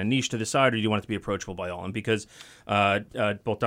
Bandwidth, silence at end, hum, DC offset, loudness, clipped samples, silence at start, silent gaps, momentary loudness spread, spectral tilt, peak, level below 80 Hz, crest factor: 16 kHz; 0 s; none; under 0.1%; -27 LUFS; under 0.1%; 0 s; none; 10 LU; -4.5 dB/octave; -8 dBFS; -58 dBFS; 18 dB